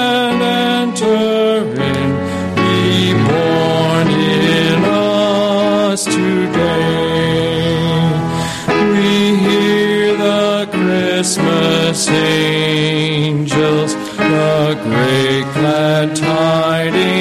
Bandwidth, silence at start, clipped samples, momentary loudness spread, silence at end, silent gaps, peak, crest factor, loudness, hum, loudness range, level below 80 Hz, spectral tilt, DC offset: 15 kHz; 0 s; under 0.1%; 3 LU; 0 s; none; -2 dBFS; 10 dB; -13 LUFS; none; 1 LU; -46 dBFS; -5 dB/octave; under 0.1%